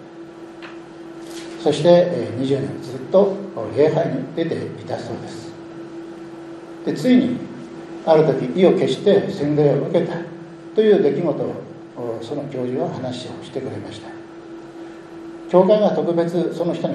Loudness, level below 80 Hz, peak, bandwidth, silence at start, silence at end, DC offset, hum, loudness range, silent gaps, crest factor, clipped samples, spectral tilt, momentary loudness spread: -19 LUFS; -64 dBFS; -2 dBFS; 12 kHz; 0 s; 0 s; under 0.1%; none; 9 LU; none; 18 dB; under 0.1%; -7.5 dB/octave; 21 LU